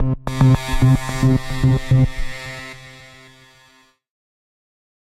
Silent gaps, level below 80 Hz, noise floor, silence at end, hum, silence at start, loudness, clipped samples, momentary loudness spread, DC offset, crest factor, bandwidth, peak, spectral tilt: none; -30 dBFS; -54 dBFS; 2.2 s; none; 0 s; -17 LUFS; under 0.1%; 17 LU; under 0.1%; 16 dB; 13 kHz; -4 dBFS; -7 dB/octave